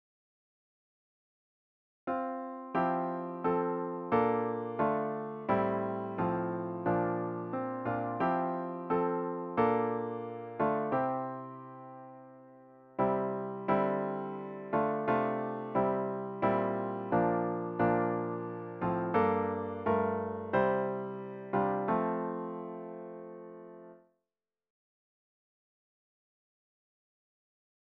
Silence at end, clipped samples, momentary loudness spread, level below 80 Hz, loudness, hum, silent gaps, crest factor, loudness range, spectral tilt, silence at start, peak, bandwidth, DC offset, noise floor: 4 s; under 0.1%; 13 LU; -68 dBFS; -33 LUFS; none; none; 18 dB; 5 LU; -7 dB/octave; 2.05 s; -16 dBFS; 5.4 kHz; under 0.1%; under -90 dBFS